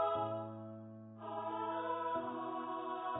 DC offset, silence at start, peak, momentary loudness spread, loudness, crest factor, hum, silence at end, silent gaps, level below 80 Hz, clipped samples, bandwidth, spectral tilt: under 0.1%; 0 s; -24 dBFS; 12 LU; -41 LUFS; 16 dB; none; 0 s; none; -78 dBFS; under 0.1%; 3.9 kHz; -2.5 dB/octave